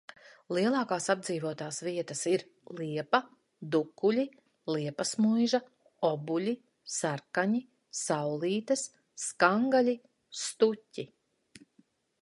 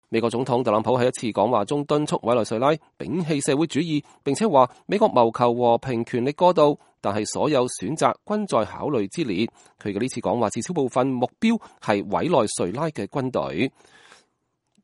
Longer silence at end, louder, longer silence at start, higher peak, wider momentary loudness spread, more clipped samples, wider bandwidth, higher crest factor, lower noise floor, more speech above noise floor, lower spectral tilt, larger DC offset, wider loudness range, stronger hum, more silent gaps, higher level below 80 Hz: about the same, 1.15 s vs 1.15 s; second, -31 LUFS vs -23 LUFS; first, 0.5 s vs 0.1 s; second, -8 dBFS vs -2 dBFS; first, 13 LU vs 8 LU; neither; about the same, 11.5 kHz vs 11.5 kHz; about the same, 24 dB vs 20 dB; second, -68 dBFS vs -74 dBFS; second, 38 dB vs 51 dB; about the same, -4.5 dB/octave vs -5.5 dB/octave; neither; about the same, 3 LU vs 4 LU; neither; neither; second, -82 dBFS vs -62 dBFS